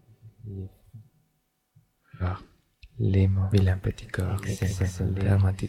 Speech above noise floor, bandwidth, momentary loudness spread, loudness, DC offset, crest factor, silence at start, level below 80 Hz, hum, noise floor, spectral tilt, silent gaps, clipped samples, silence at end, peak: 49 dB; 12.5 kHz; 17 LU; -27 LUFS; under 0.1%; 18 dB; 0.25 s; -48 dBFS; none; -73 dBFS; -7.5 dB/octave; none; under 0.1%; 0 s; -10 dBFS